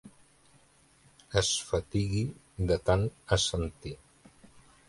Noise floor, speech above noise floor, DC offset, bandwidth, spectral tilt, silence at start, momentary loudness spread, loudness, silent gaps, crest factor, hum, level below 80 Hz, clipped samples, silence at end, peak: -63 dBFS; 33 dB; under 0.1%; 11.5 kHz; -4.5 dB/octave; 0.05 s; 11 LU; -30 LUFS; none; 22 dB; none; -46 dBFS; under 0.1%; 0.95 s; -10 dBFS